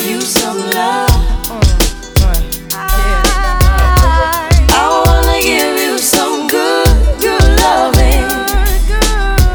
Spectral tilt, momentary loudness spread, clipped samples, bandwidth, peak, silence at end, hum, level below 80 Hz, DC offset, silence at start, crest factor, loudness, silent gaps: -4 dB/octave; 5 LU; 0.3%; over 20 kHz; 0 dBFS; 0 s; none; -12 dBFS; under 0.1%; 0 s; 10 dB; -11 LUFS; none